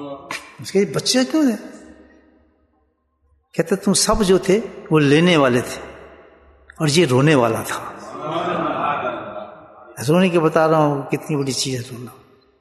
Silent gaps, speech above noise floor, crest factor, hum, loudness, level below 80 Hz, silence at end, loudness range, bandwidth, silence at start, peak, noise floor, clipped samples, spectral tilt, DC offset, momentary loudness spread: none; 48 dB; 18 dB; none; -18 LUFS; -44 dBFS; 0.45 s; 5 LU; 12.5 kHz; 0 s; -2 dBFS; -65 dBFS; under 0.1%; -5 dB/octave; under 0.1%; 18 LU